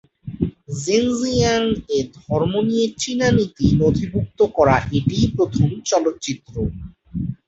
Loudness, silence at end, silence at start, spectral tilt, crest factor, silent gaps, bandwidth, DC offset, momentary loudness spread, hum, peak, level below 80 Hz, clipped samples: -20 LUFS; 0.1 s; 0.25 s; -5.5 dB/octave; 18 dB; none; 8.2 kHz; under 0.1%; 11 LU; none; -2 dBFS; -38 dBFS; under 0.1%